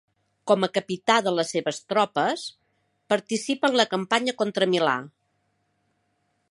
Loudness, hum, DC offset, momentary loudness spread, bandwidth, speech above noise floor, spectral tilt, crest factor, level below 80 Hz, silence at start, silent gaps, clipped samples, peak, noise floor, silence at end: -24 LUFS; none; under 0.1%; 7 LU; 11.5 kHz; 48 dB; -4 dB/octave; 22 dB; -76 dBFS; 0.45 s; none; under 0.1%; -4 dBFS; -72 dBFS; 1.45 s